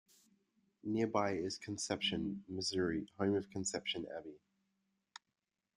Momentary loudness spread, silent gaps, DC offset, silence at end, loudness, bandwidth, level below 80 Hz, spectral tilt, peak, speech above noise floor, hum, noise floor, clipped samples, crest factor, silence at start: 19 LU; none; under 0.1%; 1.4 s; -38 LUFS; 12.5 kHz; -72 dBFS; -4 dB/octave; -18 dBFS; 51 dB; none; -89 dBFS; under 0.1%; 22 dB; 0.85 s